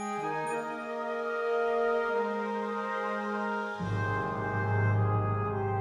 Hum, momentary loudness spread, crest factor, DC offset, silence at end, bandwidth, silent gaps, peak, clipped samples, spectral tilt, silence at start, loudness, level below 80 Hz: none; 6 LU; 14 dB; under 0.1%; 0 s; 10.5 kHz; none; -18 dBFS; under 0.1%; -7.5 dB/octave; 0 s; -31 LUFS; -58 dBFS